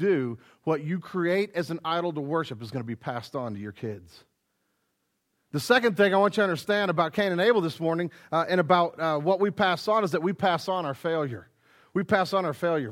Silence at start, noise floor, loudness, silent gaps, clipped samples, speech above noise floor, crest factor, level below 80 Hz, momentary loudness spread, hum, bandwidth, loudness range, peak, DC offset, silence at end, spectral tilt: 0 s; -76 dBFS; -26 LUFS; none; under 0.1%; 50 dB; 20 dB; -70 dBFS; 12 LU; none; 16.5 kHz; 9 LU; -6 dBFS; under 0.1%; 0 s; -6 dB/octave